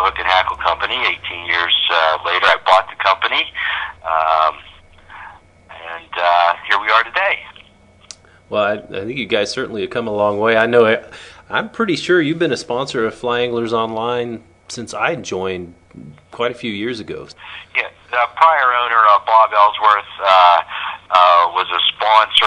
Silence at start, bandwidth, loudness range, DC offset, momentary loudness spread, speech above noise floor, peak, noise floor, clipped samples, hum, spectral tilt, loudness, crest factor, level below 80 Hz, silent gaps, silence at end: 0 s; 11 kHz; 10 LU; under 0.1%; 14 LU; 31 dB; 0 dBFS; -47 dBFS; under 0.1%; none; -3.5 dB/octave; -15 LUFS; 16 dB; -52 dBFS; none; 0 s